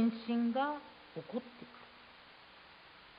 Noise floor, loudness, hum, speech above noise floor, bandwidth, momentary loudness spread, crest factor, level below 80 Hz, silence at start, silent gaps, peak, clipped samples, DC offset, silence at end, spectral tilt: -58 dBFS; -38 LUFS; none; 21 dB; 5 kHz; 22 LU; 16 dB; -78 dBFS; 0 s; none; -24 dBFS; under 0.1%; under 0.1%; 0 s; -4 dB/octave